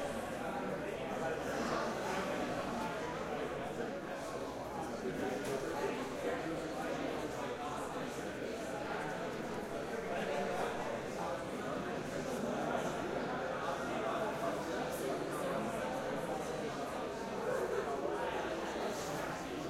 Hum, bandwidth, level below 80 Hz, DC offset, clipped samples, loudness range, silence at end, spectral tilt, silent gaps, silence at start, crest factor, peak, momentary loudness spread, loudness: none; 16.5 kHz; -62 dBFS; under 0.1%; under 0.1%; 2 LU; 0 s; -4.5 dB/octave; none; 0 s; 14 dB; -24 dBFS; 4 LU; -39 LUFS